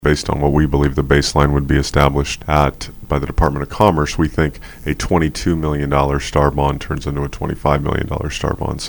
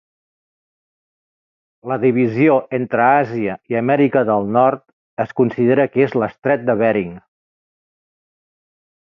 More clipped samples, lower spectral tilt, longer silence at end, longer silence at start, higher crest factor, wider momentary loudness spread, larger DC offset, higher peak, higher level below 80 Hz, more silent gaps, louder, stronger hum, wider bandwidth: neither; second, -6 dB/octave vs -10 dB/octave; second, 0 s vs 1.9 s; second, 0 s vs 1.85 s; about the same, 16 dB vs 18 dB; about the same, 8 LU vs 10 LU; neither; about the same, 0 dBFS vs -2 dBFS; first, -24 dBFS vs -60 dBFS; second, none vs 4.93-5.17 s; about the same, -17 LUFS vs -17 LUFS; neither; first, 19.5 kHz vs 6 kHz